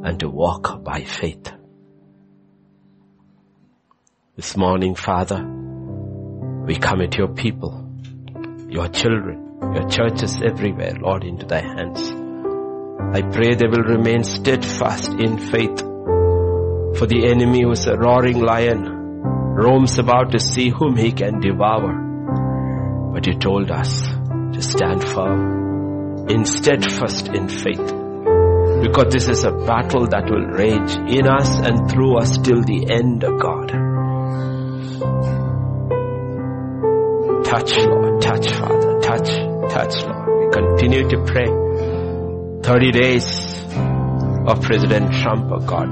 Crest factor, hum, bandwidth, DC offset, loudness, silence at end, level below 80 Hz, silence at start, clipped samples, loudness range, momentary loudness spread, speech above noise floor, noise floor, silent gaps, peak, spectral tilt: 16 dB; none; 8.8 kHz; under 0.1%; -18 LUFS; 0 s; -38 dBFS; 0 s; under 0.1%; 7 LU; 11 LU; 44 dB; -61 dBFS; none; -2 dBFS; -6 dB/octave